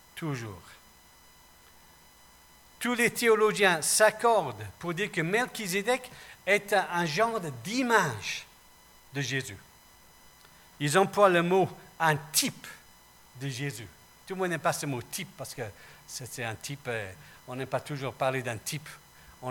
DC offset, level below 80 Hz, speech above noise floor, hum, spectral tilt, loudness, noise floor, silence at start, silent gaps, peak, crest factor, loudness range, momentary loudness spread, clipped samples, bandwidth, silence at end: under 0.1%; -66 dBFS; 28 dB; none; -3.5 dB/octave; -28 LUFS; -57 dBFS; 0.15 s; none; -8 dBFS; 22 dB; 9 LU; 19 LU; under 0.1%; 19 kHz; 0 s